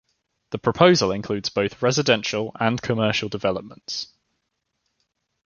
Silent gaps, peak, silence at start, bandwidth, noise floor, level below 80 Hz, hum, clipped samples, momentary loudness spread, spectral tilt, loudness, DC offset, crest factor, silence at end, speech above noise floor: none; -2 dBFS; 0.5 s; 7.2 kHz; -76 dBFS; -56 dBFS; none; under 0.1%; 14 LU; -4.5 dB/octave; -22 LUFS; under 0.1%; 22 dB; 1.4 s; 55 dB